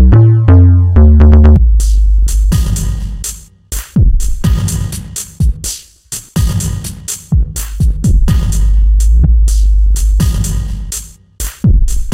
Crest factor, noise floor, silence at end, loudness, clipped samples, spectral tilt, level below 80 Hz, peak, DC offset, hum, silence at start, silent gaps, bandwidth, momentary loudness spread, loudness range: 8 dB; -28 dBFS; 0 s; -12 LUFS; under 0.1%; -6 dB/octave; -10 dBFS; 0 dBFS; under 0.1%; none; 0 s; none; 16 kHz; 16 LU; 8 LU